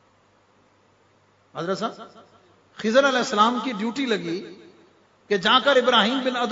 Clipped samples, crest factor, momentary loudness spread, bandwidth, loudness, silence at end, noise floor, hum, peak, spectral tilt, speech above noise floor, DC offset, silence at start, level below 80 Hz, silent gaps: under 0.1%; 20 dB; 16 LU; 7.8 kHz; -21 LUFS; 0 s; -60 dBFS; none; -4 dBFS; -3.5 dB/octave; 38 dB; under 0.1%; 1.55 s; -70 dBFS; none